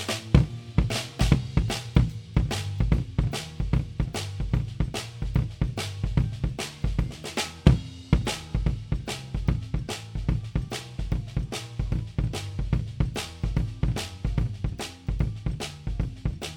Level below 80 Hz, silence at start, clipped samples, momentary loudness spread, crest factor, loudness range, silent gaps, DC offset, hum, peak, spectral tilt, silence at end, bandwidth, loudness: -32 dBFS; 0 s; under 0.1%; 9 LU; 24 dB; 4 LU; none; under 0.1%; none; -2 dBFS; -6 dB/octave; 0 s; 17 kHz; -29 LUFS